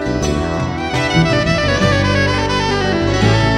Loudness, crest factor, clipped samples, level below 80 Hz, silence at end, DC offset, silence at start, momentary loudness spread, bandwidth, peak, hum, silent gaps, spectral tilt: -15 LUFS; 14 dB; under 0.1%; -28 dBFS; 0 s; under 0.1%; 0 s; 5 LU; 11.5 kHz; 0 dBFS; none; none; -5.5 dB/octave